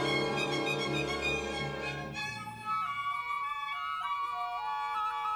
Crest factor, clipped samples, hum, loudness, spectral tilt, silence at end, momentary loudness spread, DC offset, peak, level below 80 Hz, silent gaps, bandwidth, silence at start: 14 dB; under 0.1%; none; -33 LUFS; -4 dB/octave; 0 s; 6 LU; under 0.1%; -20 dBFS; -56 dBFS; none; over 20 kHz; 0 s